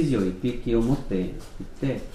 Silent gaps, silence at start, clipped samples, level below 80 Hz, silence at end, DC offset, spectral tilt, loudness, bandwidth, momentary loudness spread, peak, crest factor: none; 0 s; under 0.1%; -36 dBFS; 0 s; under 0.1%; -8 dB/octave; -27 LUFS; 13.5 kHz; 12 LU; -10 dBFS; 16 dB